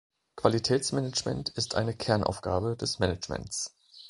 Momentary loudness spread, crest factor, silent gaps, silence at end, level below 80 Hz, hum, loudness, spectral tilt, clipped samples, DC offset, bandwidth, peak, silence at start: 7 LU; 26 dB; none; 0 s; -50 dBFS; none; -30 LUFS; -4.5 dB/octave; under 0.1%; under 0.1%; 11.5 kHz; -4 dBFS; 0.35 s